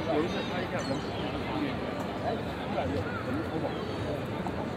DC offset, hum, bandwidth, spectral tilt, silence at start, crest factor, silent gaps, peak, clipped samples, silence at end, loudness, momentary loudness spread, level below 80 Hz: under 0.1%; none; 16 kHz; -6.5 dB/octave; 0 s; 16 dB; none; -16 dBFS; under 0.1%; 0 s; -33 LUFS; 3 LU; -52 dBFS